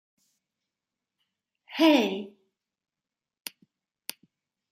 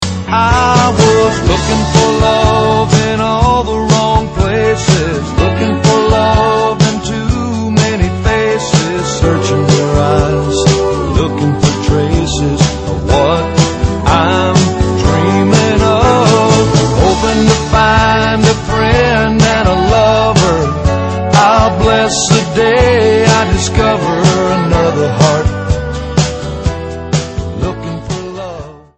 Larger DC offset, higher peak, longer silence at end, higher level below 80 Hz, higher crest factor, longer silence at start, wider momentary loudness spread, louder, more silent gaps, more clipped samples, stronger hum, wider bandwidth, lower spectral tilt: neither; second, -8 dBFS vs 0 dBFS; first, 2.4 s vs 0.2 s; second, -86 dBFS vs -24 dBFS; first, 24 dB vs 10 dB; first, 1.7 s vs 0 s; first, 21 LU vs 7 LU; second, -24 LUFS vs -11 LUFS; neither; neither; neither; first, 16 kHz vs 8.8 kHz; about the same, -4 dB/octave vs -5 dB/octave